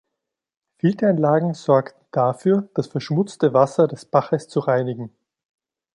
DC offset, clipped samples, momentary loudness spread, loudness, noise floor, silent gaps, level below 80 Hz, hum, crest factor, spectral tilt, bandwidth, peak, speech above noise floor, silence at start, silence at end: under 0.1%; under 0.1%; 9 LU; -20 LUFS; -82 dBFS; none; -66 dBFS; none; 18 dB; -8 dB/octave; 11 kHz; -2 dBFS; 63 dB; 0.85 s; 0.85 s